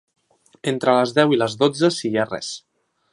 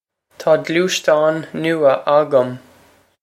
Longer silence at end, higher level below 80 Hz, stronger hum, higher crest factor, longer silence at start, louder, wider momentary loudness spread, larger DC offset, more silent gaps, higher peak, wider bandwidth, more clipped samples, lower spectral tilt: about the same, 0.55 s vs 0.65 s; about the same, -66 dBFS vs -68 dBFS; neither; about the same, 20 dB vs 16 dB; first, 0.65 s vs 0.4 s; second, -20 LUFS vs -16 LUFS; first, 12 LU vs 9 LU; neither; neither; about the same, -2 dBFS vs -2 dBFS; second, 11.5 kHz vs 15.5 kHz; neither; about the same, -5 dB/octave vs -4.5 dB/octave